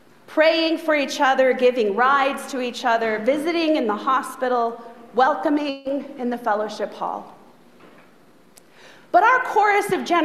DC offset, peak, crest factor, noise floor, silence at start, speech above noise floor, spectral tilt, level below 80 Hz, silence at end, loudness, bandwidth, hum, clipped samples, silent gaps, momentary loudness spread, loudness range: 0.2%; -4 dBFS; 18 dB; -53 dBFS; 0.3 s; 33 dB; -3.5 dB/octave; -72 dBFS; 0 s; -20 LUFS; 14.5 kHz; none; under 0.1%; none; 10 LU; 7 LU